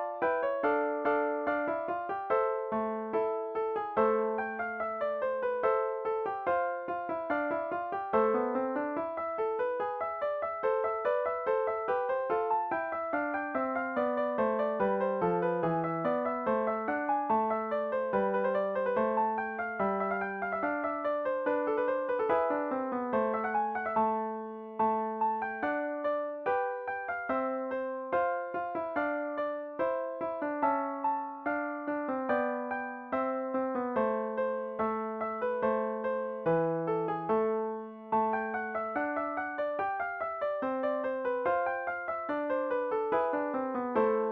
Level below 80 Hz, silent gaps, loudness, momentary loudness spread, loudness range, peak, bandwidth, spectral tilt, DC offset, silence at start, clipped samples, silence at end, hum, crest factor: -70 dBFS; none; -32 LUFS; 5 LU; 2 LU; -14 dBFS; 4.6 kHz; -9 dB/octave; under 0.1%; 0 s; under 0.1%; 0 s; none; 16 dB